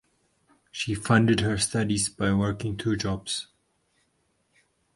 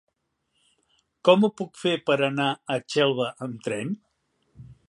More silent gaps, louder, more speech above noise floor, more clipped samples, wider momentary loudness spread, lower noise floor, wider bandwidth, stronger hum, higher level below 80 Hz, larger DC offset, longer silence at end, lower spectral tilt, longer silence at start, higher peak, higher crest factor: neither; about the same, -26 LUFS vs -24 LUFS; second, 46 dB vs 52 dB; neither; about the same, 11 LU vs 11 LU; second, -71 dBFS vs -76 dBFS; about the same, 11.5 kHz vs 11.5 kHz; neither; first, -50 dBFS vs -68 dBFS; neither; first, 1.55 s vs 0.15 s; about the same, -4.5 dB/octave vs -5.5 dB/octave; second, 0.75 s vs 1.25 s; about the same, -4 dBFS vs -2 dBFS; about the same, 24 dB vs 24 dB